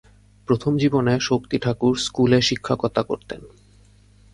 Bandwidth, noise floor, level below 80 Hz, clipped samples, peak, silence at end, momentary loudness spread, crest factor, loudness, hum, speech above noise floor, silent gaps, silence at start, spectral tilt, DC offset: 11.5 kHz; -52 dBFS; -50 dBFS; under 0.1%; -4 dBFS; 0.85 s; 12 LU; 18 dB; -21 LUFS; none; 32 dB; none; 0.5 s; -5.5 dB/octave; under 0.1%